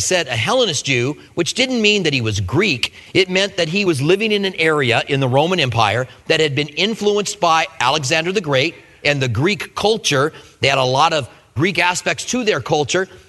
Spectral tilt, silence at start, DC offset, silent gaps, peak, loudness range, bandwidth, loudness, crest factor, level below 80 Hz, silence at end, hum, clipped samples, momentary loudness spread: -4 dB/octave; 0 s; under 0.1%; none; 0 dBFS; 1 LU; 12.5 kHz; -17 LUFS; 18 dB; -50 dBFS; 0.1 s; none; under 0.1%; 5 LU